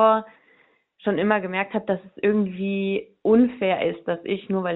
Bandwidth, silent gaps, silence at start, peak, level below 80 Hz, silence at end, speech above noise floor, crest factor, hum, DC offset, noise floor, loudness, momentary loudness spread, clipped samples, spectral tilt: 4.1 kHz; none; 0 s; -4 dBFS; -62 dBFS; 0 s; 38 dB; 18 dB; none; under 0.1%; -61 dBFS; -23 LUFS; 8 LU; under 0.1%; -10 dB/octave